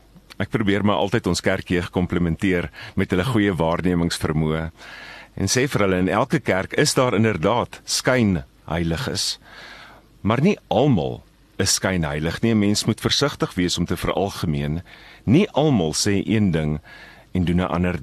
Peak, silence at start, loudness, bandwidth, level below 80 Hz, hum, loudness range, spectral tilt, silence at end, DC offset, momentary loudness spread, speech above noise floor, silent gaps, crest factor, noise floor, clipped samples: -4 dBFS; 0.3 s; -21 LUFS; 13 kHz; -42 dBFS; none; 2 LU; -5 dB/octave; 0 s; under 0.1%; 10 LU; 25 dB; none; 18 dB; -45 dBFS; under 0.1%